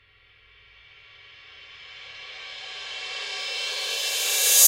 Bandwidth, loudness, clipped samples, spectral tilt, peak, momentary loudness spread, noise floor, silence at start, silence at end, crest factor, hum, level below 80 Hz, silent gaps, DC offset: 16 kHz; -26 LUFS; under 0.1%; 4 dB/octave; -2 dBFS; 24 LU; -57 dBFS; 1.2 s; 0 s; 26 dB; none; -70 dBFS; none; under 0.1%